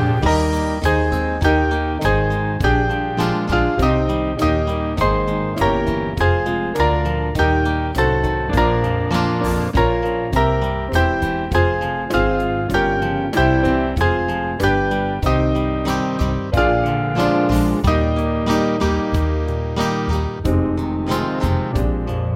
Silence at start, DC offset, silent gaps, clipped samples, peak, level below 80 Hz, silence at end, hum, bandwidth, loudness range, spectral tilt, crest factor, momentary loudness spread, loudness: 0 s; under 0.1%; none; under 0.1%; -2 dBFS; -26 dBFS; 0 s; none; 16 kHz; 1 LU; -7 dB/octave; 16 dB; 4 LU; -19 LUFS